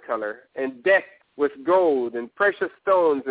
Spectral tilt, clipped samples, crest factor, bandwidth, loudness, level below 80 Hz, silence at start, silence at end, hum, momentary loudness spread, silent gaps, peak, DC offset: -8 dB/octave; under 0.1%; 16 dB; 4 kHz; -23 LUFS; -68 dBFS; 0.1 s; 0 s; none; 11 LU; none; -6 dBFS; under 0.1%